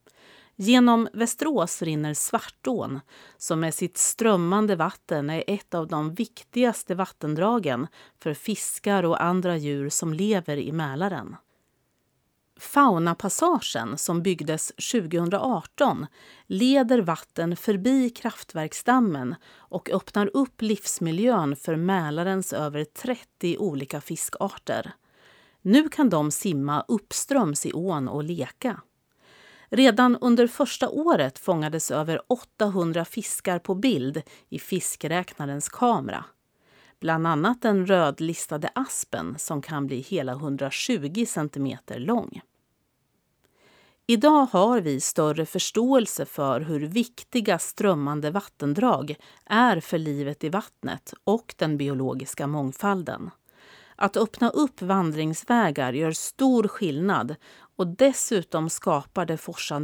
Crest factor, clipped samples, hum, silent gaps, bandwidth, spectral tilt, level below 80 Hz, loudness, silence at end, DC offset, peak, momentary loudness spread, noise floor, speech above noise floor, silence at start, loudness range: 20 dB; under 0.1%; none; none; over 20 kHz; -4.5 dB/octave; -68 dBFS; -25 LUFS; 0 s; under 0.1%; -4 dBFS; 11 LU; -72 dBFS; 47 dB; 0.6 s; 5 LU